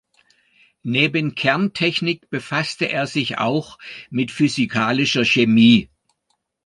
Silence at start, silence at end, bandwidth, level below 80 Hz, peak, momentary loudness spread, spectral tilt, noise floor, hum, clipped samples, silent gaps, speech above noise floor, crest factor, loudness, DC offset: 0.85 s; 0.8 s; 10.5 kHz; -58 dBFS; -2 dBFS; 12 LU; -5 dB/octave; -71 dBFS; none; under 0.1%; none; 52 dB; 18 dB; -18 LUFS; under 0.1%